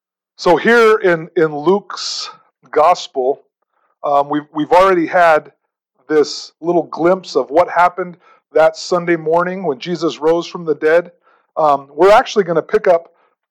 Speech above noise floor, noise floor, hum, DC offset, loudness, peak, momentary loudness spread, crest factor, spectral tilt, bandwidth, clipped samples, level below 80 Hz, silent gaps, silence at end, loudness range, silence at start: 50 dB; -64 dBFS; none; under 0.1%; -15 LUFS; -2 dBFS; 11 LU; 14 dB; -5 dB/octave; 13 kHz; under 0.1%; -52 dBFS; none; 0.5 s; 3 LU; 0.4 s